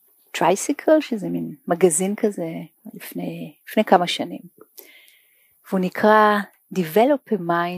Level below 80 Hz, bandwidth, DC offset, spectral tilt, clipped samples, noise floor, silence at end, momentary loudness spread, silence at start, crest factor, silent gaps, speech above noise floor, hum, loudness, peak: -78 dBFS; 15.5 kHz; under 0.1%; -4.5 dB/octave; under 0.1%; -59 dBFS; 0 s; 16 LU; 0.35 s; 20 dB; none; 39 dB; none; -20 LUFS; 0 dBFS